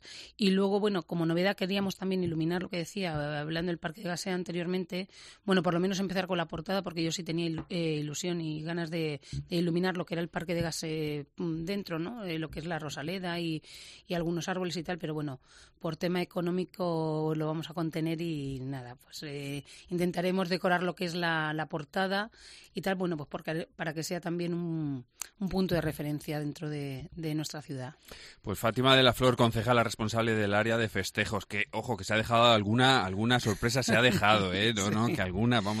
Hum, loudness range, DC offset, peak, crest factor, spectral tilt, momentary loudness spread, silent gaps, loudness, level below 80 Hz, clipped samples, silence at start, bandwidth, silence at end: none; 8 LU; under 0.1%; -8 dBFS; 22 dB; -5 dB/octave; 13 LU; none; -31 LUFS; -56 dBFS; under 0.1%; 0.05 s; 14.5 kHz; 0 s